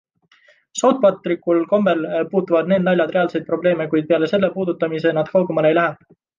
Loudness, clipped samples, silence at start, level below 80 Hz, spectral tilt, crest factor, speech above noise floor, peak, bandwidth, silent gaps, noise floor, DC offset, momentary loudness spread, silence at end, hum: -18 LUFS; under 0.1%; 0.75 s; -64 dBFS; -6 dB/octave; 14 dB; 37 dB; -4 dBFS; 9.8 kHz; none; -55 dBFS; under 0.1%; 4 LU; 0.45 s; none